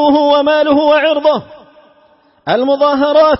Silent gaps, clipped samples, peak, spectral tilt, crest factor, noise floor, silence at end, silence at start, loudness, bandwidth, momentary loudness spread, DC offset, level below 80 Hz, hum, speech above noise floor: none; under 0.1%; 0 dBFS; -8 dB/octave; 12 dB; -50 dBFS; 0 s; 0 s; -11 LUFS; 5.8 kHz; 7 LU; under 0.1%; -46 dBFS; none; 39 dB